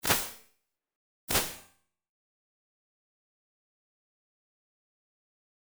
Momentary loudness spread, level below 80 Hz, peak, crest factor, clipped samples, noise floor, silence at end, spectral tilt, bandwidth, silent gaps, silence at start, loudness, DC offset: 22 LU; -56 dBFS; -10 dBFS; 30 dB; under 0.1%; -74 dBFS; 4.1 s; -1.5 dB/octave; over 20 kHz; 0.96-1.28 s; 0.05 s; -30 LUFS; under 0.1%